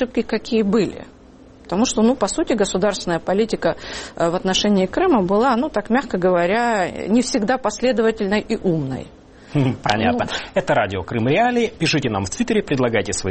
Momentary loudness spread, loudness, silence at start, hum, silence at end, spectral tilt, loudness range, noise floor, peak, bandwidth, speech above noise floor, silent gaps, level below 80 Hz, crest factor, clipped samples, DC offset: 6 LU; -19 LUFS; 0 s; none; 0 s; -5 dB/octave; 2 LU; -44 dBFS; 0 dBFS; 8.8 kHz; 26 dB; none; -44 dBFS; 20 dB; under 0.1%; under 0.1%